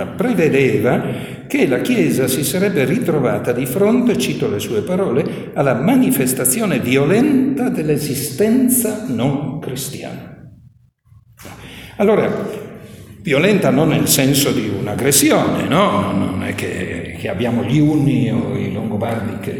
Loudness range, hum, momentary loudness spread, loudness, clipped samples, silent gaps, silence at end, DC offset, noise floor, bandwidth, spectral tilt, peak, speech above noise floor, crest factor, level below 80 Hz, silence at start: 7 LU; none; 11 LU; -16 LUFS; under 0.1%; none; 0 s; under 0.1%; -49 dBFS; over 20 kHz; -5 dB/octave; 0 dBFS; 33 dB; 16 dB; -48 dBFS; 0 s